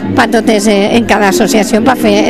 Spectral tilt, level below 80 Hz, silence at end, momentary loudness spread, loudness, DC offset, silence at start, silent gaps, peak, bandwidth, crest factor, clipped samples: -4.5 dB/octave; -38 dBFS; 0 s; 1 LU; -9 LUFS; 2%; 0 s; none; 0 dBFS; 15.5 kHz; 8 dB; 0.7%